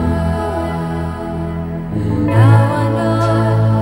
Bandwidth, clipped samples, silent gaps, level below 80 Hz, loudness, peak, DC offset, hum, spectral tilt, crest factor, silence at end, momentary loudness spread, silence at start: 11 kHz; under 0.1%; none; -30 dBFS; -16 LUFS; 0 dBFS; under 0.1%; none; -8.5 dB/octave; 14 dB; 0 s; 12 LU; 0 s